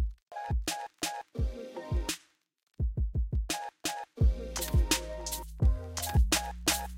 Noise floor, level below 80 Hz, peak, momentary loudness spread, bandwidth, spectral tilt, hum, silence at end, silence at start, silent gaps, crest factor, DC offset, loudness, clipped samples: -60 dBFS; -34 dBFS; -14 dBFS; 9 LU; 16.5 kHz; -3.5 dB/octave; none; 0 s; 0 s; 0.23-0.27 s; 18 dB; under 0.1%; -33 LUFS; under 0.1%